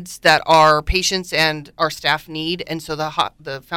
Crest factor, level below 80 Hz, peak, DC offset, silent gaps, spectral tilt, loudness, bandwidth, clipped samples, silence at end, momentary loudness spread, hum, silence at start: 16 dB; -36 dBFS; -2 dBFS; under 0.1%; none; -3 dB/octave; -17 LUFS; 17 kHz; under 0.1%; 0 s; 12 LU; none; 0 s